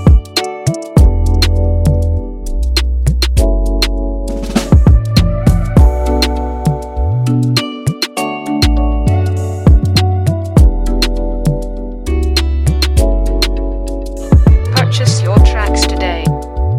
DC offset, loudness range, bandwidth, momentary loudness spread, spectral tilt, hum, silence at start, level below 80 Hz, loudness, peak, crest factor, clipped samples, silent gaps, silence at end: under 0.1%; 3 LU; 15 kHz; 9 LU; -6 dB/octave; none; 0 s; -14 dBFS; -13 LUFS; 0 dBFS; 12 dB; under 0.1%; none; 0 s